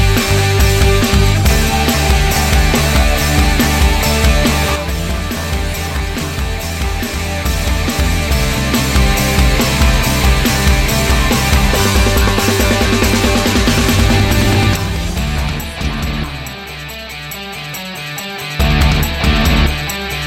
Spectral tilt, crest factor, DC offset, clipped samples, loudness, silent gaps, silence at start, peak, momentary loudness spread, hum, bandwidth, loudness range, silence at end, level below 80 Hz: -4.5 dB/octave; 12 dB; under 0.1%; under 0.1%; -14 LUFS; none; 0 s; 0 dBFS; 10 LU; none; 17 kHz; 6 LU; 0 s; -16 dBFS